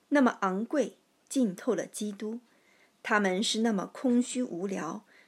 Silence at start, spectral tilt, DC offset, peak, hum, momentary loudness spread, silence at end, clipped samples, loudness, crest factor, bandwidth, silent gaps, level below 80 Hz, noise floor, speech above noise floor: 0.1 s; -4.5 dB/octave; under 0.1%; -10 dBFS; none; 12 LU; 0.25 s; under 0.1%; -30 LUFS; 20 dB; 13 kHz; none; under -90 dBFS; -65 dBFS; 35 dB